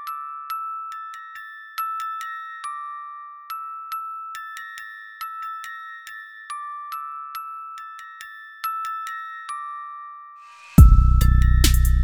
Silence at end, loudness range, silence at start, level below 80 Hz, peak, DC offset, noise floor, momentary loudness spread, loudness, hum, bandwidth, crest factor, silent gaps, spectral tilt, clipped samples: 0 s; 13 LU; 0 s; -24 dBFS; 0 dBFS; under 0.1%; -44 dBFS; 19 LU; -24 LUFS; none; 18.5 kHz; 22 dB; none; -5 dB/octave; under 0.1%